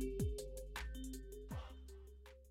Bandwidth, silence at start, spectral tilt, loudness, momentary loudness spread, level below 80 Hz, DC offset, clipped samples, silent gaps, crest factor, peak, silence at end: 16.5 kHz; 0 s; -5.5 dB/octave; -48 LUFS; 15 LU; -50 dBFS; under 0.1%; under 0.1%; none; 16 dB; -30 dBFS; 0 s